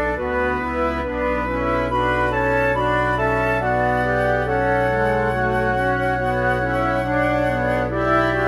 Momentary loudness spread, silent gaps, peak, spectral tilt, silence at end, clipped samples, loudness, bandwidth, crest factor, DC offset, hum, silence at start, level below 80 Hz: 3 LU; none; -6 dBFS; -7 dB/octave; 0 s; under 0.1%; -20 LUFS; 13 kHz; 14 dB; 0.2%; none; 0 s; -34 dBFS